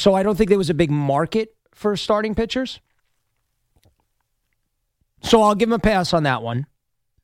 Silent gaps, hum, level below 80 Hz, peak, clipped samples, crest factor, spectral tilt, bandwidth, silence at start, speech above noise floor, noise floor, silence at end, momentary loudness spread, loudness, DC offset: none; none; -42 dBFS; -2 dBFS; under 0.1%; 18 dB; -6 dB/octave; 16 kHz; 0 s; 54 dB; -72 dBFS; 0.6 s; 14 LU; -19 LUFS; under 0.1%